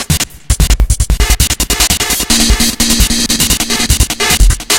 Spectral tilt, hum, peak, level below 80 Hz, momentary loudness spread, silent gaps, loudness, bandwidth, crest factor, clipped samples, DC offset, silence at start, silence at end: -2.5 dB/octave; none; 0 dBFS; -14 dBFS; 4 LU; none; -10 LUFS; 17.5 kHz; 10 dB; 0.7%; under 0.1%; 0 s; 0 s